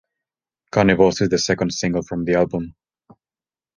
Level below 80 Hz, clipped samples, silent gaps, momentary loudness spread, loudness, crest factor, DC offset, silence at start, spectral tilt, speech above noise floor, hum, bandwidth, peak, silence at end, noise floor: -48 dBFS; under 0.1%; none; 8 LU; -19 LUFS; 20 dB; under 0.1%; 0.75 s; -5 dB/octave; over 72 dB; none; 10 kHz; 0 dBFS; 1.05 s; under -90 dBFS